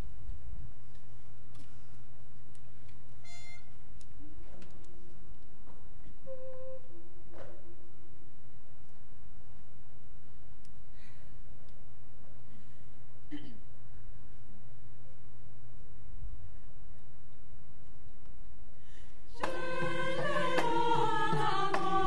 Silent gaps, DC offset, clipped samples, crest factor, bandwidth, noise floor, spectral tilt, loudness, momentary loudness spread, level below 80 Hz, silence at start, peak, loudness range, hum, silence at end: none; 5%; under 0.1%; 24 dB; 11.5 kHz; -59 dBFS; -5.5 dB/octave; -35 LUFS; 28 LU; -56 dBFS; 0 s; -16 dBFS; 24 LU; none; 0 s